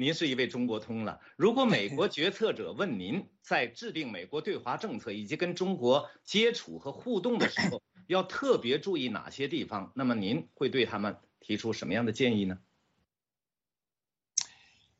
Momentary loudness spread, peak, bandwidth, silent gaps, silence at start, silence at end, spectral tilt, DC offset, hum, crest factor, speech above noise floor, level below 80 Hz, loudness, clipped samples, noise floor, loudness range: 10 LU; -12 dBFS; 8.4 kHz; none; 0 s; 0.5 s; -4.5 dB/octave; under 0.1%; none; 20 dB; over 59 dB; -72 dBFS; -31 LUFS; under 0.1%; under -90 dBFS; 4 LU